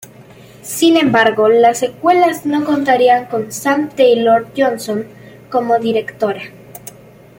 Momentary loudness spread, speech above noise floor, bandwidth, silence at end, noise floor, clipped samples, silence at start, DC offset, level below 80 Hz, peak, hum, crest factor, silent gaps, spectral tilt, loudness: 16 LU; 27 dB; 17 kHz; 0.6 s; -40 dBFS; under 0.1%; 0.2 s; under 0.1%; -58 dBFS; 0 dBFS; none; 14 dB; none; -4 dB/octave; -14 LUFS